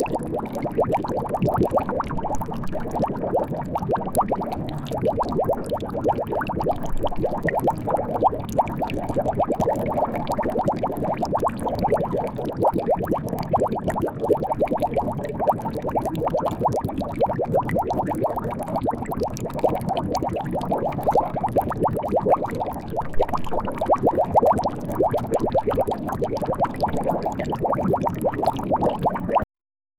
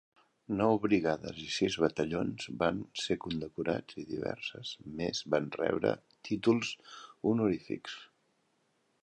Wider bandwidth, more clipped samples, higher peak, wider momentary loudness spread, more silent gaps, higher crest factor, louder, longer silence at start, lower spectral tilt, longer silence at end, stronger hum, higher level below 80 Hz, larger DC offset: first, 18.5 kHz vs 10 kHz; neither; first, -6 dBFS vs -12 dBFS; second, 5 LU vs 11 LU; neither; second, 16 dB vs 22 dB; first, -24 LUFS vs -33 LUFS; second, 0 s vs 0.5 s; first, -7.5 dB/octave vs -5.5 dB/octave; second, 0.55 s vs 1 s; neither; first, -40 dBFS vs -62 dBFS; neither